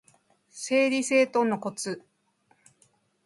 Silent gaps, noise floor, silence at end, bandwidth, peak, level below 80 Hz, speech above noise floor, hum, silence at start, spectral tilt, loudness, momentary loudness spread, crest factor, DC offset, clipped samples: none; -68 dBFS; 1.25 s; 11.5 kHz; -10 dBFS; -78 dBFS; 43 dB; none; 0.55 s; -3.5 dB/octave; -25 LUFS; 14 LU; 20 dB; under 0.1%; under 0.1%